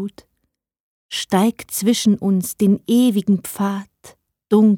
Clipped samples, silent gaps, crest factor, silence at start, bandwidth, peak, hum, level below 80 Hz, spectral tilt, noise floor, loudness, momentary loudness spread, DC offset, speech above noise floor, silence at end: under 0.1%; 0.80-1.09 s; 14 dB; 0 s; 18 kHz; -4 dBFS; none; -60 dBFS; -5.5 dB/octave; -73 dBFS; -18 LUFS; 10 LU; under 0.1%; 56 dB; 0 s